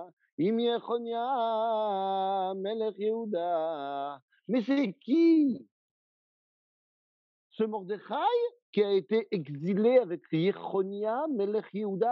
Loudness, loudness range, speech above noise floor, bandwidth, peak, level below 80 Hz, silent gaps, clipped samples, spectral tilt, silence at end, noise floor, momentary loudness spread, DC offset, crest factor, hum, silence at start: -30 LUFS; 3 LU; over 61 dB; 6 kHz; -12 dBFS; under -90 dBFS; 0.13-0.17 s, 0.32-0.38 s, 4.22-4.28 s, 5.71-7.50 s, 8.62-8.73 s; under 0.1%; -5.5 dB/octave; 0 s; under -90 dBFS; 10 LU; under 0.1%; 18 dB; none; 0 s